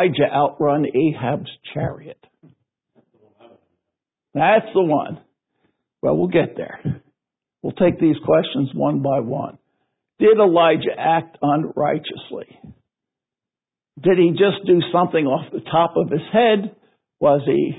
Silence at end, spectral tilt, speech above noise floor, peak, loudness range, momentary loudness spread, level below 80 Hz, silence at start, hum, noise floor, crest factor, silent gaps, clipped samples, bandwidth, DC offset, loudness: 0 s; -11.5 dB/octave; 72 dB; -2 dBFS; 6 LU; 15 LU; -56 dBFS; 0 s; none; -90 dBFS; 18 dB; none; under 0.1%; 4 kHz; under 0.1%; -18 LUFS